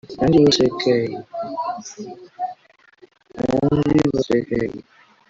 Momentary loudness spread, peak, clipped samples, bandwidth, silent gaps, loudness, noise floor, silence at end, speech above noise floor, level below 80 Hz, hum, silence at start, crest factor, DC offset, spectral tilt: 17 LU; -4 dBFS; under 0.1%; 7.8 kHz; none; -20 LUFS; -54 dBFS; 0.5 s; 35 dB; -46 dBFS; none; 0.1 s; 16 dB; under 0.1%; -6 dB/octave